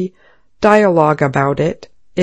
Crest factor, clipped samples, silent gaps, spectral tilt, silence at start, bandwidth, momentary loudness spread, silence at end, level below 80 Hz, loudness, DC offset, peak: 14 dB; 0.2%; none; -7 dB/octave; 0 s; 11 kHz; 15 LU; 0 s; -48 dBFS; -13 LUFS; under 0.1%; 0 dBFS